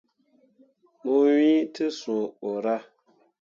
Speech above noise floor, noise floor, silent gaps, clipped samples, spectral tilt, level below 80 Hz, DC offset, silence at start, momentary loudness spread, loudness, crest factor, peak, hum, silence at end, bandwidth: 41 dB; -64 dBFS; none; under 0.1%; -5.5 dB/octave; -82 dBFS; under 0.1%; 1.05 s; 11 LU; -25 LUFS; 14 dB; -12 dBFS; none; 0.6 s; 7.4 kHz